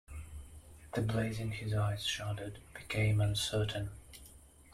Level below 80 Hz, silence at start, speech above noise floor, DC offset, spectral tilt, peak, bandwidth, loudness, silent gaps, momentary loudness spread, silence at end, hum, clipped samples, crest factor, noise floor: -54 dBFS; 0.1 s; 23 dB; under 0.1%; -5 dB/octave; -22 dBFS; 14.5 kHz; -35 LUFS; none; 21 LU; 0 s; none; under 0.1%; 14 dB; -57 dBFS